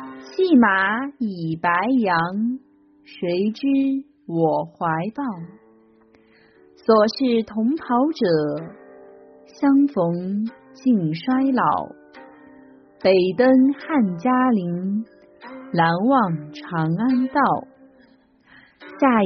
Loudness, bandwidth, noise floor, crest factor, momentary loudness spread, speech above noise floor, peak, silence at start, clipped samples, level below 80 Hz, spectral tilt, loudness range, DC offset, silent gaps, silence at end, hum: -20 LUFS; 6.2 kHz; -55 dBFS; 16 dB; 12 LU; 36 dB; -4 dBFS; 0 s; under 0.1%; -64 dBFS; -5.5 dB/octave; 4 LU; under 0.1%; none; 0 s; none